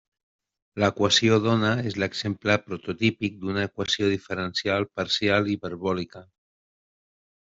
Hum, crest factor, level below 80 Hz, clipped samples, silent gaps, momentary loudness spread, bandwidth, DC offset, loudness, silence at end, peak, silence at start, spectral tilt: none; 20 dB; -62 dBFS; under 0.1%; none; 9 LU; 8 kHz; under 0.1%; -25 LUFS; 1.3 s; -6 dBFS; 0.75 s; -4.5 dB/octave